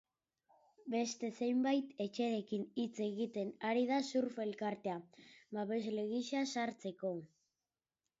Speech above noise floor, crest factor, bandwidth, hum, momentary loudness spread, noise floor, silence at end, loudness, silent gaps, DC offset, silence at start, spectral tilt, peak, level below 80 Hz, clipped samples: over 52 dB; 16 dB; 7.6 kHz; none; 8 LU; under -90 dBFS; 0.95 s; -39 LUFS; none; under 0.1%; 0.85 s; -4.5 dB/octave; -24 dBFS; -86 dBFS; under 0.1%